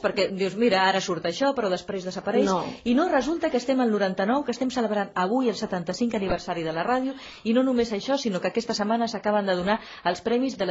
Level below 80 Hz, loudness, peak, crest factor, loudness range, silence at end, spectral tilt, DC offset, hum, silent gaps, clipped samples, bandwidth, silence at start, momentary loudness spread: -54 dBFS; -25 LUFS; -8 dBFS; 18 dB; 2 LU; 0 s; -5 dB/octave; under 0.1%; none; none; under 0.1%; 8 kHz; 0 s; 6 LU